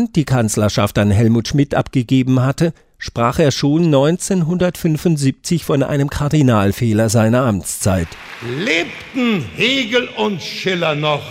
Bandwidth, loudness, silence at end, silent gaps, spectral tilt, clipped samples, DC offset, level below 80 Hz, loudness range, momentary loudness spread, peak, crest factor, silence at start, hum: 16 kHz; -16 LUFS; 0 s; none; -5.5 dB/octave; under 0.1%; under 0.1%; -42 dBFS; 2 LU; 7 LU; -2 dBFS; 14 dB; 0 s; none